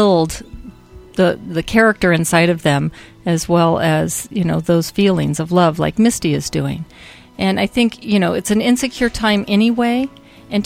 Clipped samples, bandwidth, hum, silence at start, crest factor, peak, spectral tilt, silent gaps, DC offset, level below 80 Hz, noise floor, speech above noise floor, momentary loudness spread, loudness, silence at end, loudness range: under 0.1%; 16 kHz; none; 0 s; 16 dB; 0 dBFS; -5.5 dB/octave; none; under 0.1%; -40 dBFS; -38 dBFS; 23 dB; 10 LU; -16 LUFS; 0 s; 2 LU